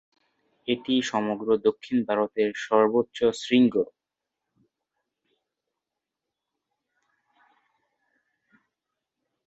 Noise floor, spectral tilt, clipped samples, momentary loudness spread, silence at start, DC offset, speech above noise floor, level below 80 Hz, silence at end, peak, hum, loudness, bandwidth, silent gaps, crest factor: -86 dBFS; -5 dB/octave; under 0.1%; 8 LU; 0.65 s; under 0.1%; 63 dB; -68 dBFS; 5.6 s; -6 dBFS; none; -25 LUFS; 8 kHz; none; 22 dB